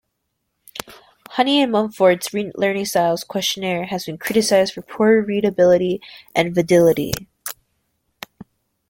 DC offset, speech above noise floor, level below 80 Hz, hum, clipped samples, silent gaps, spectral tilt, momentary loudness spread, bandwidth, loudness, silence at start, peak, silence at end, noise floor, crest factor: under 0.1%; 56 dB; -54 dBFS; none; under 0.1%; none; -4.5 dB/octave; 18 LU; 17 kHz; -18 LUFS; 0.75 s; 0 dBFS; 1.4 s; -74 dBFS; 20 dB